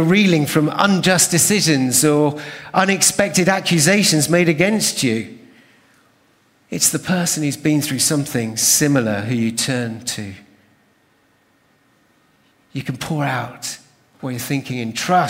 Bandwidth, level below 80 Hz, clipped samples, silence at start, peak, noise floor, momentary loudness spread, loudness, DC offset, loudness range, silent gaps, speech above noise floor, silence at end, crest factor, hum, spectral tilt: 16.5 kHz; -56 dBFS; under 0.1%; 0 s; 0 dBFS; -58 dBFS; 15 LU; -16 LUFS; under 0.1%; 13 LU; none; 41 dB; 0 s; 18 dB; none; -3.5 dB/octave